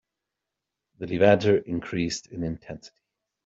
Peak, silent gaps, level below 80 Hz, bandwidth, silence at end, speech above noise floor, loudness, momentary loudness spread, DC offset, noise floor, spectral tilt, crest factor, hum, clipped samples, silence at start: -4 dBFS; none; -56 dBFS; 7.8 kHz; 0.6 s; 61 dB; -25 LUFS; 20 LU; under 0.1%; -85 dBFS; -5.5 dB/octave; 22 dB; none; under 0.1%; 1 s